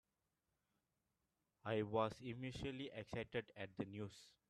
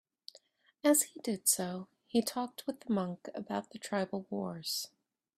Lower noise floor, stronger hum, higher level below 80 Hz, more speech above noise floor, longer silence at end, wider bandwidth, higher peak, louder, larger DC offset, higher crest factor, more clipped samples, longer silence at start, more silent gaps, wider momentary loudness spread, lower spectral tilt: first, -90 dBFS vs -65 dBFS; neither; first, -72 dBFS vs -78 dBFS; first, 43 dB vs 30 dB; second, 0.2 s vs 0.5 s; second, 13 kHz vs 16 kHz; second, -24 dBFS vs -12 dBFS; second, -47 LUFS vs -34 LUFS; neither; about the same, 24 dB vs 24 dB; neither; first, 1.65 s vs 0.85 s; neither; second, 11 LU vs 16 LU; first, -6.5 dB/octave vs -3.5 dB/octave